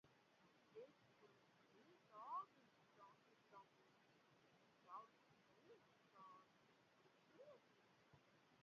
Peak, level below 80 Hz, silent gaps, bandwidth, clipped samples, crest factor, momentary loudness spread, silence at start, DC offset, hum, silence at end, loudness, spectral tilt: -42 dBFS; under -90 dBFS; none; 6.8 kHz; under 0.1%; 24 dB; 15 LU; 0.05 s; under 0.1%; none; 0 s; -61 LUFS; -3 dB/octave